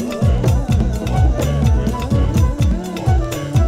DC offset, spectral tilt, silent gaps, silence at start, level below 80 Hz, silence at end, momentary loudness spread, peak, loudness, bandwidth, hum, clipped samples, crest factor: under 0.1%; -7 dB/octave; none; 0 s; -20 dBFS; 0 s; 3 LU; -2 dBFS; -17 LUFS; 15.5 kHz; none; under 0.1%; 12 dB